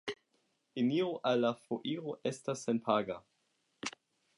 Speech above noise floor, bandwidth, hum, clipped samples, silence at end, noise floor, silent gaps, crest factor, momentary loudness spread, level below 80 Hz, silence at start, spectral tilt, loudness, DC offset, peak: 44 dB; 11.5 kHz; none; under 0.1%; 0.5 s; -78 dBFS; none; 20 dB; 12 LU; -80 dBFS; 0.05 s; -5 dB/octave; -35 LUFS; under 0.1%; -16 dBFS